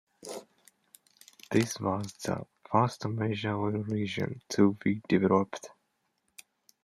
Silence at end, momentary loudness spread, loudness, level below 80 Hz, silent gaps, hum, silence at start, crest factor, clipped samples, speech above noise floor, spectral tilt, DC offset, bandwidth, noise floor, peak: 1.15 s; 17 LU; -30 LUFS; -70 dBFS; none; none; 0.25 s; 22 dB; under 0.1%; 48 dB; -6 dB/octave; under 0.1%; 15 kHz; -77 dBFS; -10 dBFS